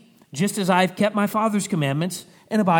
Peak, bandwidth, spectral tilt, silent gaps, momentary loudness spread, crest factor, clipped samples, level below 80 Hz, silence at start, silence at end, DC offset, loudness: -4 dBFS; over 20 kHz; -5.5 dB/octave; none; 8 LU; 16 dB; under 0.1%; -70 dBFS; 0.35 s; 0 s; under 0.1%; -22 LUFS